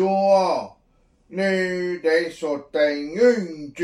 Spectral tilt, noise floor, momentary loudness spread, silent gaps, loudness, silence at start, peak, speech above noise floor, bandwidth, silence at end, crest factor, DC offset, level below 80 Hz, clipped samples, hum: -5.5 dB/octave; -60 dBFS; 10 LU; none; -21 LUFS; 0 s; -6 dBFS; 39 dB; 11.5 kHz; 0 s; 16 dB; under 0.1%; -62 dBFS; under 0.1%; none